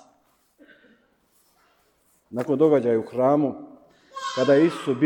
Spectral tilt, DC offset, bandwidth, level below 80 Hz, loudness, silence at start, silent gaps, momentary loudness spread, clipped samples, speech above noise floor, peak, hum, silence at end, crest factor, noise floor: -6.5 dB/octave; under 0.1%; 11.5 kHz; -72 dBFS; -22 LUFS; 2.3 s; none; 16 LU; under 0.1%; 44 dB; -8 dBFS; none; 0 s; 18 dB; -64 dBFS